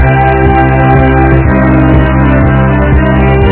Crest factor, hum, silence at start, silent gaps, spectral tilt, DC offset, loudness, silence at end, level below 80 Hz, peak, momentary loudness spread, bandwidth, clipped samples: 6 dB; none; 0 s; none; -12 dB/octave; under 0.1%; -7 LUFS; 0 s; -12 dBFS; 0 dBFS; 1 LU; 4 kHz; 3%